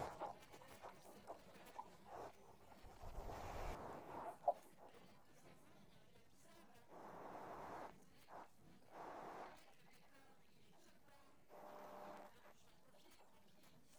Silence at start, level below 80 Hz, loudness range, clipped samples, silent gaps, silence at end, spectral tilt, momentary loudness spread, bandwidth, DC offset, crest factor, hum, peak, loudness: 0 s; -66 dBFS; 11 LU; under 0.1%; none; 0 s; -5 dB/octave; 17 LU; over 20 kHz; under 0.1%; 28 dB; none; -28 dBFS; -55 LUFS